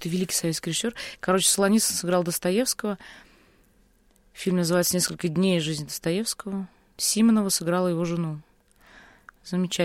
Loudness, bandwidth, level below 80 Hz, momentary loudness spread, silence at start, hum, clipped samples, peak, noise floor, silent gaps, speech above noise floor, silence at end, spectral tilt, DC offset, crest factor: -24 LUFS; 16.5 kHz; -60 dBFS; 12 LU; 0 s; none; under 0.1%; -8 dBFS; -61 dBFS; none; 36 dB; 0 s; -4 dB/octave; under 0.1%; 18 dB